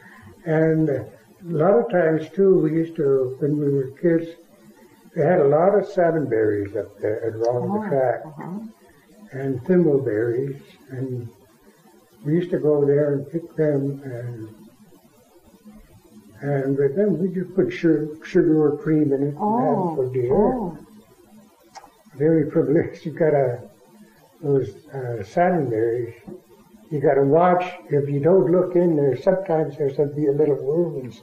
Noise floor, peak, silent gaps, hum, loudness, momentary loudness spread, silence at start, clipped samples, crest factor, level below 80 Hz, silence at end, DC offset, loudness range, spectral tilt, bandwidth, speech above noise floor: -53 dBFS; -6 dBFS; none; none; -21 LUFS; 15 LU; 0.25 s; under 0.1%; 16 dB; -56 dBFS; 0.05 s; under 0.1%; 5 LU; -9.5 dB/octave; 9.4 kHz; 33 dB